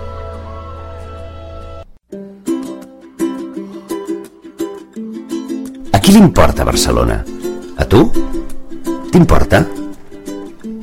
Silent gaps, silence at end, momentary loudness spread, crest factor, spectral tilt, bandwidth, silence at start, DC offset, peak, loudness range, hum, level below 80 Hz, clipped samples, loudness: none; 0 s; 21 LU; 14 dB; -5.5 dB/octave; 16.5 kHz; 0 s; under 0.1%; 0 dBFS; 13 LU; none; -24 dBFS; under 0.1%; -14 LUFS